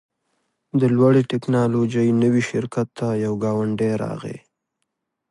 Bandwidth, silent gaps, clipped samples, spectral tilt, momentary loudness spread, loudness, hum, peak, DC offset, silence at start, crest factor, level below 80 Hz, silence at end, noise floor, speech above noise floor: 11.5 kHz; none; under 0.1%; -8 dB/octave; 10 LU; -20 LUFS; none; -4 dBFS; under 0.1%; 0.75 s; 16 dB; -60 dBFS; 0.9 s; -77 dBFS; 58 dB